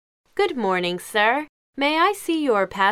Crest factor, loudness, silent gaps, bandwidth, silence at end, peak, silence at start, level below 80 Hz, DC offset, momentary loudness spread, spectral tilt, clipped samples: 16 dB; -21 LUFS; 1.49-1.73 s; 16.5 kHz; 0 s; -6 dBFS; 0.35 s; -62 dBFS; under 0.1%; 6 LU; -4 dB/octave; under 0.1%